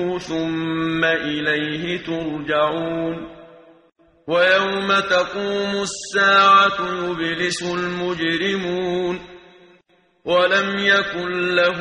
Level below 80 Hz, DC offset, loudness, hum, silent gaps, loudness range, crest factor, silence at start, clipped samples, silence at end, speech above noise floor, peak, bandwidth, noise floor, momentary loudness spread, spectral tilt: -54 dBFS; under 0.1%; -19 LUFS; none; none; 6 LU; 18 dB; 0 s; under 0.1%; 0 s; 39 dB; -2 dBFS; 10.5 kHz; -58 dBFS; 10 LU; -4 dB/octave